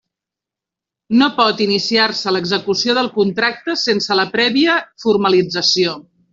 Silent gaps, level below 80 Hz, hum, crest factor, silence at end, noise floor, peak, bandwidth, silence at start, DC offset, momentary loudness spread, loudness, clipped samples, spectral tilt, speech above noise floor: none; -60 dBFS; none; 14 dB; 0.3 s; -86 dBFS; -2 dBFS; 7.8 kHz; 1.1 s; under 0.1%; 4 LU; -15 LUFS; under 0.1%; -4 dB/octave; 70 dB